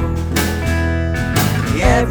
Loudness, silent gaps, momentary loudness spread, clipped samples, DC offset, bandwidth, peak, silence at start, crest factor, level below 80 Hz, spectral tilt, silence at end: -17 LUFS; none; 4 LU; under 0.1%; under 0.1%; over 20 kHz; 0 dBFS; 0 s; 16 dB; -22 dBFS; -5.5 dB/octave; 0 s